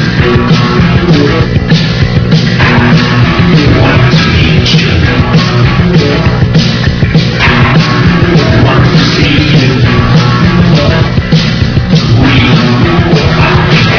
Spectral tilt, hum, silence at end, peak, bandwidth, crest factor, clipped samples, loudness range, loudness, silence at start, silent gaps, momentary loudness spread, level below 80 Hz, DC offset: -6.5 dB/octave; none; 0 s; 0 dBFS; 5.4 kHz; 6 dB; 6%; 1 LU; -6 LUFS; 0 s; none; 3 LU; -20 dBFS; under 0.1%